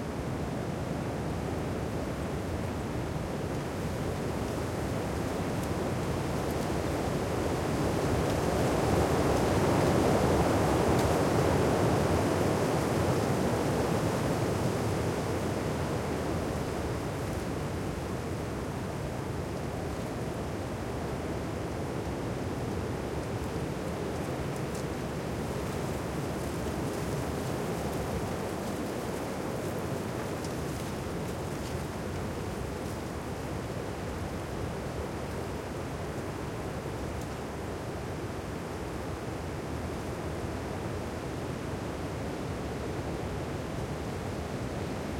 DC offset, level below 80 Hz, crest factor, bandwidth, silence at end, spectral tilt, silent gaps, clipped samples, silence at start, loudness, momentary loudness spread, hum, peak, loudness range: under 0.1%; -46 dBFS; 18 dB; 16.5 kHz; 0 s; -6 dB/octave; none; under 0.1%; 0 s; -32 LUFS; 9 LU; none; -12 dBFS; 9 LU